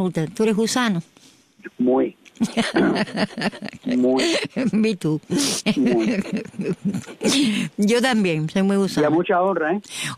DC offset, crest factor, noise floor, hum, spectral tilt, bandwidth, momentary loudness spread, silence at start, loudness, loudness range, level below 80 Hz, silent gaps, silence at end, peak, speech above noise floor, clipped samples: under 0.1%; 14 dB; -52 dBFS; none; -4.5 dB/octave; 14.5 kHz; 8 LU; 0 s; -21 LUFS; 2 LU; -58 dBFS; none; 0 s; -8 dBFS; 31 dB; under 0.1%